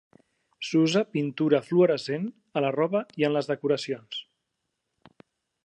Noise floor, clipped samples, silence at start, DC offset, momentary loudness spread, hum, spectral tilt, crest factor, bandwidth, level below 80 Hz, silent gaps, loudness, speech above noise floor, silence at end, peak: -81 dBFS; under 0.1%; 0.6 s; under 0.1%; 11 LU; none; -6 dB/octave; 20 dB; 10 kHz; -80 dBFS; none; -26 LUFS; 56 dB; 1.4 s; -8 dBFS